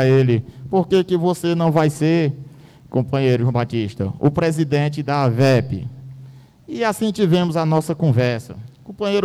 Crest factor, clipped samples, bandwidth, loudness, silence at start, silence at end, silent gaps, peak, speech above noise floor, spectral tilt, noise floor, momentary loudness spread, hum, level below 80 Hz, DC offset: 12 dB; under 0.1%; 13.5 kHz; -19 LUFS; 0 s; 0 s; none; -6 dBFS; 24 dB; -7 dB/octave; -42 dBFS; 12 LU; none; -50 dBFS; under 0.1%